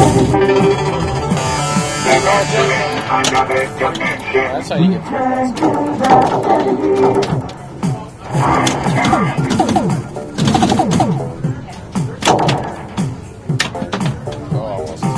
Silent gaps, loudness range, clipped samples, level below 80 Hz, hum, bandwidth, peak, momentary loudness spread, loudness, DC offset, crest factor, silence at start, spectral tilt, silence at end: none; 4 LU; under 0.1%; -38 dBFS; none; 11 kHz; 0 dBFS; 10 LU; -15 LUFS; under 0.1%; 16 dB; 0 s; -5 dB/octave; 0 s